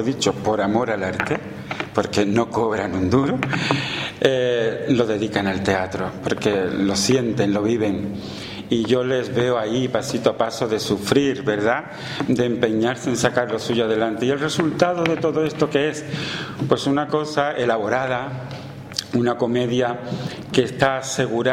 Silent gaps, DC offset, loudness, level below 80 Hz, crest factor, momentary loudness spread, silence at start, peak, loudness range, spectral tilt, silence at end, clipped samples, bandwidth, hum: none; under 0.1%; -21 LUFS; -52 dBFS; 20 dB; 7 LU; 0 s; 0 dBFS; 2 LU; -5 dB/octave; 0 s; under 0.1%; 16 kHz; none